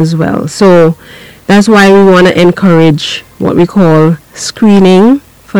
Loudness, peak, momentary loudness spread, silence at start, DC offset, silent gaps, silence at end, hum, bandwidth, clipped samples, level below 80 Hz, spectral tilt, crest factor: -6 LUFS; 0 dBFS; 11 LU; 0 s; under 0.1%; none; 0 s; none; 16 kHz; 4%; -40 dBFS; -6.5 dB/octave; 6 dB